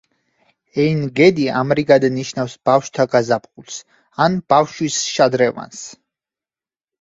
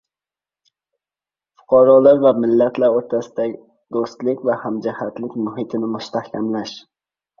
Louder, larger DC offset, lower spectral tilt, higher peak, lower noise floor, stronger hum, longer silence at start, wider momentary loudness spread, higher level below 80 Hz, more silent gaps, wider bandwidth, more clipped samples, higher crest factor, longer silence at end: about the same, -17 LUFS vs -18 LUFS; neither; second, -5 dB/octave vs -7 dB/octave; about the same, 0 dBFS vs -2 dBFS; about the same, under -90 dBFS vs under -90 dBFS; neither; second, 0.75 s vs 1.7 s; first, 18 LU vs 15 LU; about the same, -58 dBFS vs -62 dBFS; neither; first, 8 kHz vs 7 kHz; neither; about the same, 18 dB vs 18 dB; first, 1.1 s vs 0.6 s